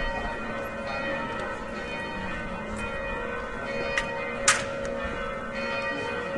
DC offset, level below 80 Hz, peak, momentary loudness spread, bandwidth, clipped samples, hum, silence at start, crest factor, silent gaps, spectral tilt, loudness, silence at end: under 0.1%; -44 dBFS; -6 dBFS; 8 LU; 12 kHz; under 0.1%; none; 0 s; 24 dB; none; -3 dB/octave; -30 LUFS; 0 s